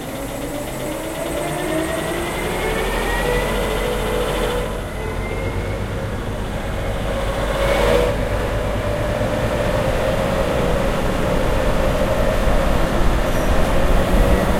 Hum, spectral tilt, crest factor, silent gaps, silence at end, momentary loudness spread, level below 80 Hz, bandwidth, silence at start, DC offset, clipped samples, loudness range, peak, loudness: none; -5.5 dB/octave; 16 dB; none; 0 s; 7 LU; -24 dBFS; 16.5 kHz; 0 s; under 0.1%; under 0.1%; 4 LU; -2 dBFS; -21 LUFS